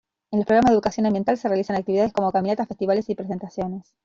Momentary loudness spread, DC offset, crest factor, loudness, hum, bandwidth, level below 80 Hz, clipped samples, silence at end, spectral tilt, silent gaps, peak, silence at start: 11 LU; under 0.1%; 16 dB; -22 LUFS; none; 7.6 kHz; -54 dBFS; under 0.1%; 0.25 s; -7 dB/octave; none; -6 dBFS; 0.3 s